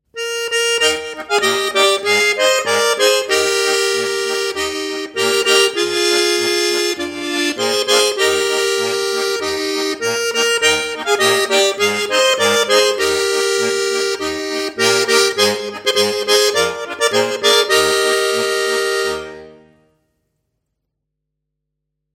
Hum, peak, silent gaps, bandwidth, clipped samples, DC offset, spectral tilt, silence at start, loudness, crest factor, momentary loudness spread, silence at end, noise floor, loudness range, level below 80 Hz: none; 0 dBFS; none; 16.5 kHz; under 0.1%; under 0.1%; -1 dB/octave; 0.15 s; -15 LUFS; 16 dB; 7 LU; 2.6 s; -77 dBFS; 2 LU; -54 dBFS